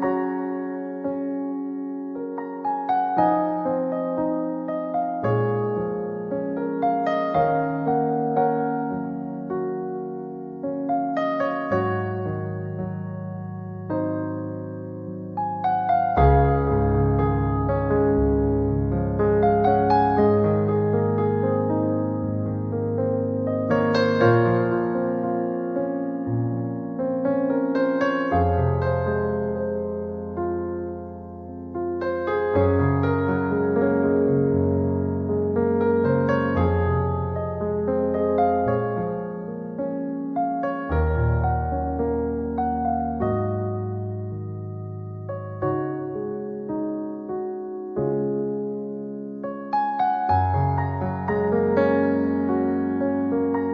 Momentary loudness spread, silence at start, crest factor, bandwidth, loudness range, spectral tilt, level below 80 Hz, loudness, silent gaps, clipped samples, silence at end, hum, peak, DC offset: 11 LU; 0 s; 18 dB; 6.4 kHz; 7 LU; -10 dB/octave; -38 dBFS; -24 LUFS; none; under 0.1%; 0 s; none; -6 dBFS; under 0.1%